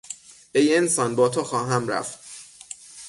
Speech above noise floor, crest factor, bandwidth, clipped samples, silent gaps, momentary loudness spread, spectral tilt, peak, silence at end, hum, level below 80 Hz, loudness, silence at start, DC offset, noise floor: 22 dB; 16 dB; 12 kHz; under 0.1%; none; 20 LU; -4 dB/octave; -8 dBFS; 0 s; none; -66 dBFS; -22 LUFS; 0.05 s; under 0.1%; -44 dBFS